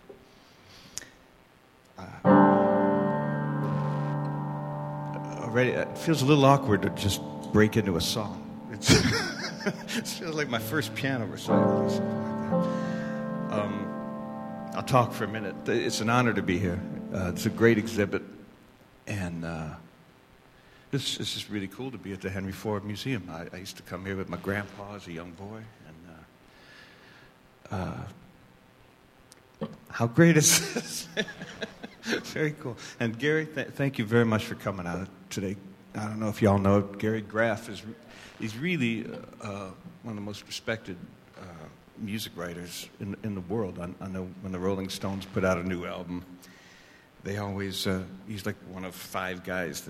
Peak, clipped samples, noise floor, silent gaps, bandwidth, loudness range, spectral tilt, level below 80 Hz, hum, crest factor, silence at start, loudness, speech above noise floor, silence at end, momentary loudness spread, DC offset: -6 dBFS; under 0.1%; -58 dBFS; none; 16 kHz; 12 LU; -5 dB/octave; -56 dBFS; none; 24 dB; 0.1 s; -28 LUFS; 29 dB; 0 s; 18 LU; under 0.1%